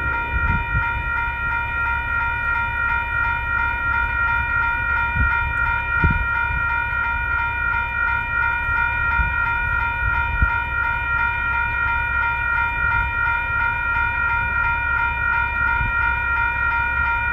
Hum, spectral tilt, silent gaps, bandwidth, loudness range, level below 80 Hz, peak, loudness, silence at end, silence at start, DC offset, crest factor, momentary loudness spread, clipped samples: none; -6.5 dB/octave; none; 13.5 kHz; 1 LU; -30 dBFS; -4 dBFS; -20 LUFS; 0 s; 0 s; under 0.1%; 16 dB; 2 LU; under 0.1%